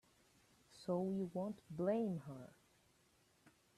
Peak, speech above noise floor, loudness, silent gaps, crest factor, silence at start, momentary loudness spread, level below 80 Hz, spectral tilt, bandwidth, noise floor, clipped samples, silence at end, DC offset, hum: -28 dBFS; 33 dB; -42 LUFS; none; 18 dB; 0.7 s; 16 LU; -80 dBFS; -8 dB/octave; 13 kHz; -75 dBFS; under 0.1%; 0.3 s; under 0.1%; none